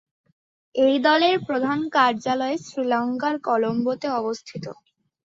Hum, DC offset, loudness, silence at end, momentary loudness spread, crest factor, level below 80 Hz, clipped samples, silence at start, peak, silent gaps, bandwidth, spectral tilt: none; under 0.1%; -22 LUFS; 0.5 s; 13 LU; 18 dB; -68 dBFS; under 0.1%; 0.75 s; -6 dBFS; none; 7.8 kHz; -5 dB/octave